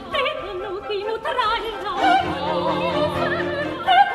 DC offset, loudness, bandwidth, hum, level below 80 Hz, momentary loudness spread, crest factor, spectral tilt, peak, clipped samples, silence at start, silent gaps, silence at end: under 0.1%; -22 LUFS; 14 kHz; none; -48 dBFS; 8 LU; 18 dB; -5 dB/octave; -4 dBFS; under 0.1%; 0 s; none; 0 s